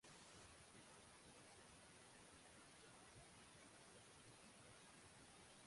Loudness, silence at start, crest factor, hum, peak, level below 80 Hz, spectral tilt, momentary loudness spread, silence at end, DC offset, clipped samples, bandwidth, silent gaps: -64 LUFS; 0.05 s; 14 dB; none; -52 dBFS; -82 dBFS; -2.5 dB/octave; 1 LU; 0 s; under 0.1%; under 0.1%; 11.5 kHz; none